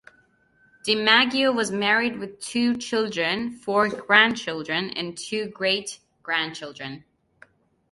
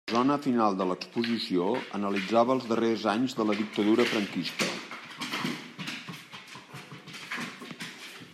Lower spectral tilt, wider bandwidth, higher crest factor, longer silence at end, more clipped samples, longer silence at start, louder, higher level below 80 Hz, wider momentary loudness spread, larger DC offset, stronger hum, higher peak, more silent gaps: second, -3 dB/octave vs -5 dB/octave; second, 11.5 kHz vs 15 kHz; first, 24 dB vs 18 dB; first, 0.95 s vs 0 s; neither; first, 0.85 s vs 0.05 s; first, -22 LUFS vs -29 LUFS; first, -66 dBFS vs -78 dBFS; about the same, 17 LU vs 18 LU; neither; neither; first, -2 dBFS vs -12 dBFS; neither